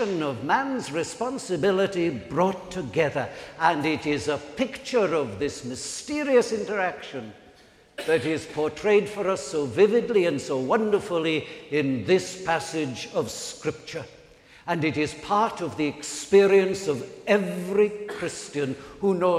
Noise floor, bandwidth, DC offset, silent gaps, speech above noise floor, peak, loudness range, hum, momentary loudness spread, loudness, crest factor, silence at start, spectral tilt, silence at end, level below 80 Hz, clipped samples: -54 dBFS; 13.5 kHz; under 0.1%; none; 29 dB; -6 dBFS; 4 LU; none; 10 LU; -25 LUFS; 20 dB; 0 s; -5 dB/octave; 0 s; -60 dBFS; under 0.1%